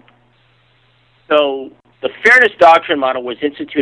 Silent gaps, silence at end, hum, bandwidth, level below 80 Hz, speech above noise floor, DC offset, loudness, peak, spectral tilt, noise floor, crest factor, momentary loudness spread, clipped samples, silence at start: none; 0 s; none; 11 kHz; -58 dBFS; 42 dB; under 0.1%; -12 LUFS; 0 dBFS; -3.5 dB/octave; -54 dBFS; 14 dB; 16 LU; under 0.1%; 1.3 s